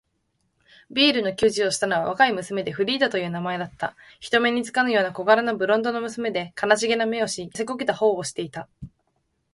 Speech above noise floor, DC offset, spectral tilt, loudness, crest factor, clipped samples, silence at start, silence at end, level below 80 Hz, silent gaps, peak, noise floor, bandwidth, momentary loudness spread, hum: 49 dB; under 0.1%; -3.5 dB/octave; -23 LUFS; 20 dB; under 0.1%; 0.9 s; 0.65 s; -60 dBFS; none; -4 dBFS; -72 dBFS; 11.5 kHz; 11 LU; none